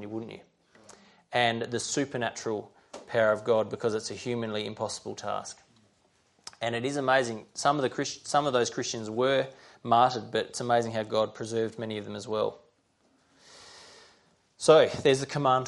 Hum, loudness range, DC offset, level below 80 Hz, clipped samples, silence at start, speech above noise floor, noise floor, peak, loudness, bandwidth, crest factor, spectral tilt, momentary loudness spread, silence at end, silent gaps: none; 7 LU; under 0.1%; -70 dBFS; under 0.1%; 0 s; 41 dB; -68 dBFS; -6 dBFS; -28 LUFS; 11.5 kHz; 22 dB; -4 dB/octave; 14 LU; 0 s; none